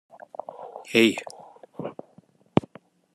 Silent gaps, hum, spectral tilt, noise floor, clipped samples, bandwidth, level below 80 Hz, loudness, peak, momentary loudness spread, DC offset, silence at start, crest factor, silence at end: none; none; -5 dB/octave; -58 dBFS; under 0.1%; 13 kHz; -68 dBFS; -24 LUFS; -2 dBFS; 24 LU; under 0.1%; 0.5 s; 26 dB; 0.55 s